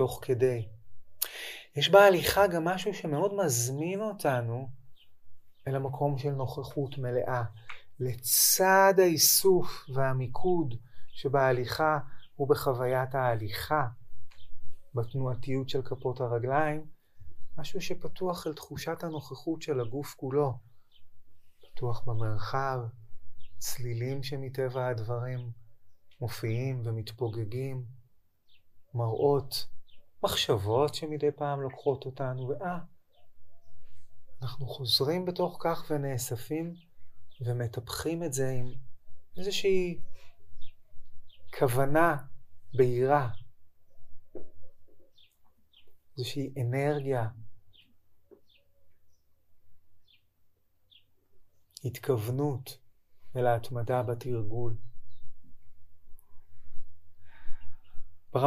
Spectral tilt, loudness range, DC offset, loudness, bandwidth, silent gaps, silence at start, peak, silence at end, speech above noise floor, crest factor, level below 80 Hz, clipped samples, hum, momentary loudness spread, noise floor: -4.5 dB/octave; 11 LU; under 0.1%; -30 LUFS; 15.5 kHz; none; 0 s; -6 dBFS; 0 s; 36 dB; 24 dB; -52 dBFS; under 0.1%; none; 14 LU; -65 dBFS